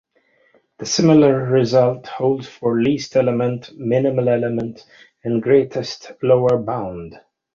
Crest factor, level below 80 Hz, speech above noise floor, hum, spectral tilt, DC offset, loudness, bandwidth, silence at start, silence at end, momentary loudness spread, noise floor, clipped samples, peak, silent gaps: 16 dB; -54 dBFS; 42 dB; none; -6 dB/octave; under 0.1%; -18 LUFS; 7.6 kHz; 0.8 s; 0.35 s; 15 LU; -60 dBFS; under 0.1%; -2 dBFS; none